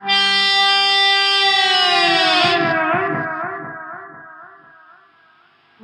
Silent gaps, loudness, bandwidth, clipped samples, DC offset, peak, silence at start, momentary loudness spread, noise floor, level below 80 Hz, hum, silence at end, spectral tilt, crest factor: none; -14 LUFS; 12.5 kHz; under 0.1%; under 0.1%; -2 dBFS; 0 s; 17 LU; -54 dBFS; -70 dBFS; none; 1.35 s; -2 dB/octave; 14 dB